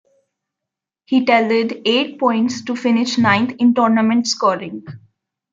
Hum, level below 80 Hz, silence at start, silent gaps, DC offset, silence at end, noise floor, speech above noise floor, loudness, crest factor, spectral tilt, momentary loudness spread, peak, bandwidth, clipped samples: none; -66 dBFS; 1.1 s; none; under 0.1%; 0.55 s; -84 dBFS; 68 dB; -16 LUFS; 16 dB; -4.5 dB/octave; 6 LU; -2 dBFS; 7.6 kHz; under 0.1%